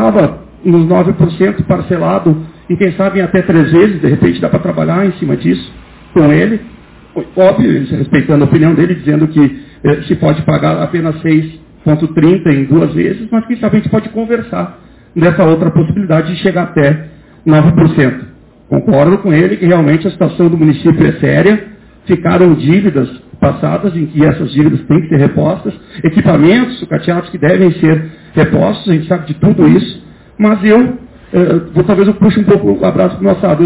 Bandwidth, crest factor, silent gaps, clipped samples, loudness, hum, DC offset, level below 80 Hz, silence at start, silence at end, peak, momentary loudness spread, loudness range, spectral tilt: 4 kHz; 10 dB; none; 0.2%; -10 LUFS; none; under 0.1%; -38 dBFS; 0 s; 0 s; 0 dBFS; 8 LU; 2 LU; -12 dB/octave